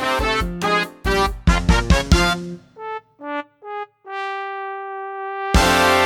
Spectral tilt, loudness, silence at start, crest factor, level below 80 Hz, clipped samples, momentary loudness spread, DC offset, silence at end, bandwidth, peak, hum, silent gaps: -4.5 dB/octave; -20 LUFS; 0 s; 18 dB; -26 dBFS; under 0.1%; 16 LU; under 0.1%; 0 s; 17 kHz; -2 dBFS; none; none